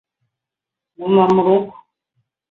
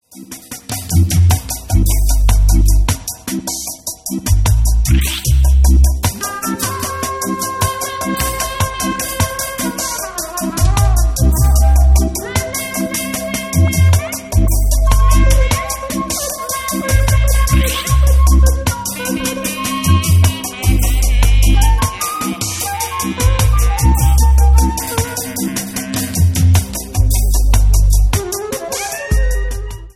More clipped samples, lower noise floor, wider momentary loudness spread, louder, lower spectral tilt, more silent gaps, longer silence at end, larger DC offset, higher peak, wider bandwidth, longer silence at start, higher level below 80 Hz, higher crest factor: neither; first, -85 dBFS vs -34 dBFS; first, 16 LU vs 9 LU; about the same, -15 LUFS vs -15 LUFS; first, -8.5 dB/octave vs -4.5 dB/octave; neither; first, 0.8 s vs 0.05 s; neither; about the same, -2 dBFS vs 0 dBFS; second, 6.6 kHz vs 16.5 kHz; first, 1 s vs 0.15 s; second, -60 dBFS vs -14 dBFS; first, 18 dB vs 12 dB